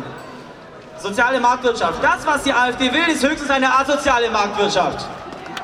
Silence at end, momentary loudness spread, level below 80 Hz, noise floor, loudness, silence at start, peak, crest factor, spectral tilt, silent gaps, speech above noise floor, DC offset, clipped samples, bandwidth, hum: 0 s; 17 LU; -46 dBFS; -38 dBFS; -17 LUFS; 0 s; -2 dBFS; 16 dB; -3 dB/octave; none; 21 dB; under 0.1%; under 0.1%; 15.5 kHz; none